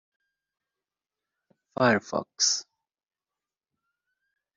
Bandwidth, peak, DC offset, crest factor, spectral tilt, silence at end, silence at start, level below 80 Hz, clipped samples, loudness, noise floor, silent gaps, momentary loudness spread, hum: 7.6 kHz; -8 dBFS; under 0.1%; 26 dB; -2.5 dB/octave; 1.95 s; 1.8 s; -72 dBFS; under 0.1%; -25 LUFS; under -90 dBFS; none; 10 LU; none